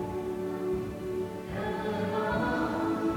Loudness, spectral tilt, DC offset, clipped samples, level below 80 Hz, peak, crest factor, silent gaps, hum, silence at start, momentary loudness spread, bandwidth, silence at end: -32 LUFS; -7 dB/octave; under 0.1%; under 0.1%; -50 dBFS; -18 dBFS; 12 dB; none; none; 0 s; 6 LU; 18 kHz; 0 s